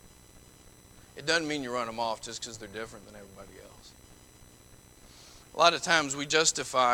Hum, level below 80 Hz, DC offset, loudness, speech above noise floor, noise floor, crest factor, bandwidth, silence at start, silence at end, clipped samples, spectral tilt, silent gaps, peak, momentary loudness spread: none; -60 dBFS; under 0.1%; -28 LUFS; 25 dB; -55 dBFS; 26 dB; 19 kHz; 0.05 s; 0 s; under 0.1%; -1.5 dB/octave; none; -6 dBFS; 25 LU